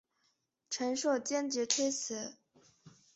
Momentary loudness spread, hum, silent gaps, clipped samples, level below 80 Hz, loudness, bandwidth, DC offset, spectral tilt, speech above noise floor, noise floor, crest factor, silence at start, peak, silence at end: 10 LU; none; none; under 0.1%; -82 dBFS; -34 LUFS; 8.2 kHz; under 0.1%; -1.5 dB/octave; 44 dB; -78 dBFS; 24 dB; 0.7 s; -12 dBFS; 0.25 s